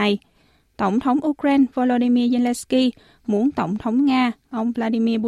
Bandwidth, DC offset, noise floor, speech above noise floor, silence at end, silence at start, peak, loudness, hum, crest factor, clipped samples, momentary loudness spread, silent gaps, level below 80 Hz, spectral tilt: 13 kHz; under 0.1%; -59 dBFS; 40 dB; 0 s; 0 s; -8 dBFS; -20 LUFS; none; 12 dB; under 0.1%; 7 LU; none; -56 dBFS; -5.5 dB/octave